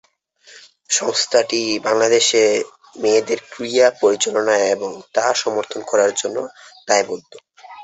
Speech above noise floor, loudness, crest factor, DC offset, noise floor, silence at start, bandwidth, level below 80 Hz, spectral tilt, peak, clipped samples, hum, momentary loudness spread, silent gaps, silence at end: 32 dB; -18 LUFS; 18 dB; under 0.1%; -50 dBFS; 0.55 s; 8.4 kHz; -66 dBFS; -1.5 dB/octave; -2 dBFS; under 0.1%; none; 11 LU; none; 0 s